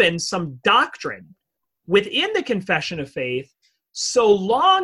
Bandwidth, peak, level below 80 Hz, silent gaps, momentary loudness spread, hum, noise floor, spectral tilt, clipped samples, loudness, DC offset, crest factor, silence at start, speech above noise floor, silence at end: 12 kHz; -4 dBFS; -60 dBFS; none; 13 LU; none; -67 dBFS; -3.5 dB/octave; under 0.1%; -20 LUFS; under 0.1%; 18 dB; 0 s; 47 dB; 0 s